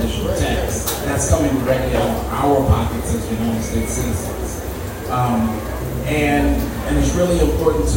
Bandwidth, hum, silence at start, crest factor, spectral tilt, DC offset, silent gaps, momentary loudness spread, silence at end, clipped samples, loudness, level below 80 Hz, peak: 16.5 kHz; none; 0 s; 16 dB; -5.5 dB/octave; under 0.1%; none; 8 LU; 0 s; under 0.1%; -19 LUFS; -26 dBFS; -2 dBFS